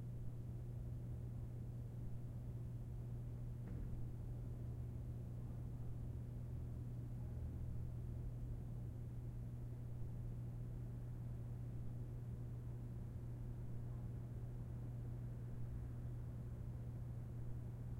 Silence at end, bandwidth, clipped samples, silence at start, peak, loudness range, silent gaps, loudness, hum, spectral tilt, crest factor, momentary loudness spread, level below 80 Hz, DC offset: 0 s; 9.2 kHz; under 0.1%; 0 s; -36 dBFS; 1 LU; none; -50 LUFS; 60 Hz at -50 dBFS; -9.5 dB/octave; 12 dB; 1 LU; -54 dBFS; under 0.1%